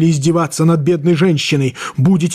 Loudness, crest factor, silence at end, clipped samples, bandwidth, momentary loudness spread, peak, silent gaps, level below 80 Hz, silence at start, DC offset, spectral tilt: -14 LUFS; 10 dB; 0 s; under 0.1%; 14 kHz; 3 LU; -4 dBFS; none; -50 dBFS; 0 s; under 0.1%; -6 dB/octave